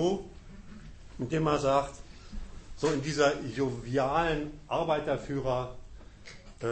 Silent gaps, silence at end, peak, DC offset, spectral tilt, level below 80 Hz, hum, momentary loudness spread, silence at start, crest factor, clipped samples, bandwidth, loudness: none; 0 s; -12 dBFS; under 0.1%; -5.5 dB/octave; -48 dBFS; none; 22 LU; 0 s; 20 dB; under 0.1%; 8.8 kHz; -30 LUFS